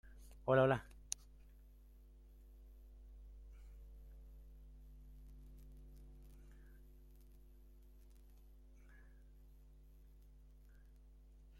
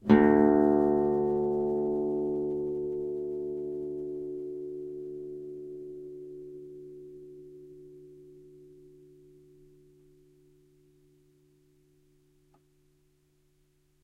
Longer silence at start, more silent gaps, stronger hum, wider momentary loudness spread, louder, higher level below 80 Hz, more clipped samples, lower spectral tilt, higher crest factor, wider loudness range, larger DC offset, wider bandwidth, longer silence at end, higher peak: about the same, 0.05 s vs 0.05 s; neither; neither; second, 21 LU vs 26 LU; second, -38 LUFS vs -29 LUFS; about the same, -60 dBFS vs -60 dBFS; neither; second, -5.5 dB/octave vs -9.5 dB/octave; about the same, 30 dB vs 26 dB; about the same, 24 LU vs 25 LU; neither; first, 16.5 kHz vs 4.4 kHz; second, 0 s vs 5.35 s; second, -18 dBFS vs -6 dBFS